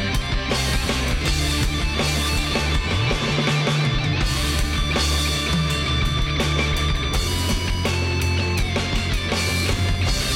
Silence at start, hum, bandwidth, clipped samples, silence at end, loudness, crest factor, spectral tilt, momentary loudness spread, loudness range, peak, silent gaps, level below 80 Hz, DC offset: 0 s; none; 16.5 kHz; under 0.1%; 0 s; -21 LUFS; 12 dB; -4 dB/octave; 2 LU; 1 LU; -8 dBFS; none; -26 dBFS; under 0.1%